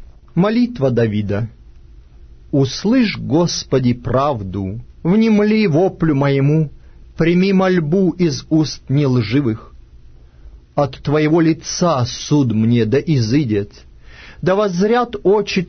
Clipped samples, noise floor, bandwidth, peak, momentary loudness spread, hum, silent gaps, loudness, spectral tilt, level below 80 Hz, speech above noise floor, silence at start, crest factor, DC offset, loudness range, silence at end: under 0.1%; -41 dBFS; 6.6 kHz; -2 dBFS; 9 LU; none; none; -16 LUFS; -6.5 dB/octave; -40 dBFS; 26 dB; 0 s; 14 dB; under 0.1%; 3 LU; 0 s